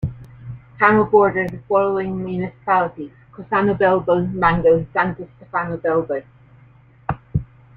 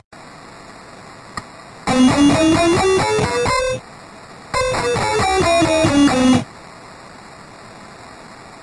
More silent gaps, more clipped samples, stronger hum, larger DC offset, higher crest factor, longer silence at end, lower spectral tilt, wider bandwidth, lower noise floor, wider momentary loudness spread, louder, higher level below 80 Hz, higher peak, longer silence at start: neither; neither; neither; neither; about the same, 18 dB vs 16 dB; first, 0.35 s vs 0 s; first, -9.5 dB/octave vs -4.5 dB/octave; second, 4.7 kHz vs 11.5 kHz; first, -49 dBFS vs -39 dBFS; second, 18 LU vs 25 LU; second, -19 LUFS vs -16 LUFS; about the same, -44 dBFS vs -40 dBFS; about the same, -2 dBFS vs -2 dBFS; second, 0 s vs 0.15 s